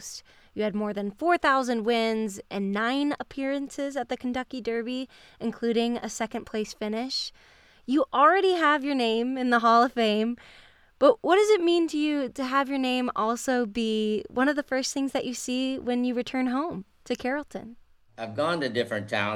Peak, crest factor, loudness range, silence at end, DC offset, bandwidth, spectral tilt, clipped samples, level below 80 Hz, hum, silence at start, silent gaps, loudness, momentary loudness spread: -6 dBFS; 20 dB; 7 LU; 0 s; under 0.1%; 14.5 kHz; -4 dB/octave; under 0.1%; -62 dBFS; none; 0 s; none; -26 LUFS; 12 LU